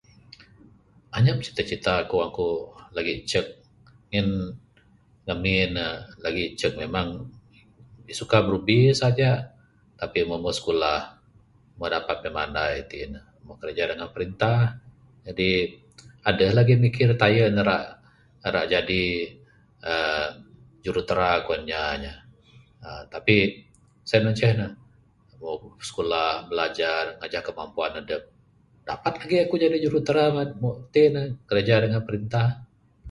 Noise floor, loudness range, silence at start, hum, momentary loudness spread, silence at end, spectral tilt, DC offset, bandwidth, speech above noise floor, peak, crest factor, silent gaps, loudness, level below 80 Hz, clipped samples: -59 dBFS; 6 LU; 1.1 s; none; 16 LU; 0 s; -6 dB/octave; under 0.1%; 11.5 kHz; 35 dB; -2 dBFS; 24 dB; none; -24 LUFS; -48 dBFS; under 0.1%